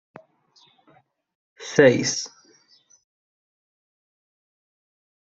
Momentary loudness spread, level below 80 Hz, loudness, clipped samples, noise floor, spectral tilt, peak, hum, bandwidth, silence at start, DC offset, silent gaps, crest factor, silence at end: 20 LU; -66 dBFS; -19 LUFS; under 0.1%; -60 dBFS; -4 dB/octave; -2 dBFS; none; 8 kHz; 1.6 s; under 0.1%; none; 24 dB; 3 s